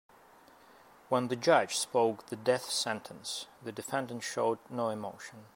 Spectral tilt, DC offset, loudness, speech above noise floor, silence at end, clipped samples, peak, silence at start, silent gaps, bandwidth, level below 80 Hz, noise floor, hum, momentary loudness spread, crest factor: -3.5 dB/octave; under 0.1%; -32 LUFS; 26 dB; 0.1 s; under 0.1%; -10 dBFS; 1.1 s; none; 16 kHz; -80 dBFS; -59 dBFS; none; 13 LU; 22 dB